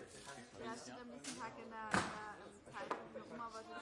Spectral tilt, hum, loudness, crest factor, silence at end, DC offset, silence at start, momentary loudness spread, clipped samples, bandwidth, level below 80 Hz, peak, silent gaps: -3.5 dB/octave; none; -47 LUFS; 30 dB; 0 s; under 0.1%; 0 s; 14 LU; under 0.1%; 11.5 kHz; -76 dBFS; -18 dBFS; none